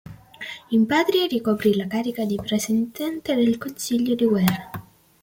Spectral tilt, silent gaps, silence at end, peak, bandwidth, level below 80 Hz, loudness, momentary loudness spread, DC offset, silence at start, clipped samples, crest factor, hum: -5 dB/octave; none; 0.4 s; -2 dBFS; 17 kHz; -58 dBFS; -22 LUFS; 13 LU; under 0.1%; 0.05 s; under 0.1%; 20 dB; none